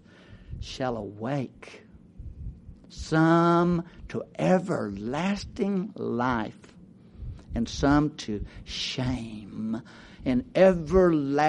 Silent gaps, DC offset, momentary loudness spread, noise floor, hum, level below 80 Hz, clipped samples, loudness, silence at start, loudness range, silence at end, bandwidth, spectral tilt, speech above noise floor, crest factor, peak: none; under 0.1%; 22 LU; -50 dBFS; none; -44 dBFS; under 0.1%; -26 LUFS; 0.3 s; 4 LU; 0 s; 10.5 kHz; -6.5 dB/octave; 24 dB; 22 dB; -6 dBFS